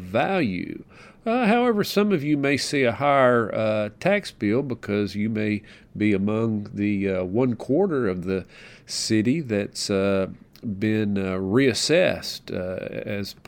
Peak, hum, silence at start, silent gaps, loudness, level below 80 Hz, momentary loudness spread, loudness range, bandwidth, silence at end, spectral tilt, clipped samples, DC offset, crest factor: -6 dBFS; none; 0 s; none; -23 LUFS; -58 dBFS; 11 LU; 4 LU; 17.5 kHz; 0.15 s; -5.5 dB/octave; under 0.1%; under 0.1%; 18 dB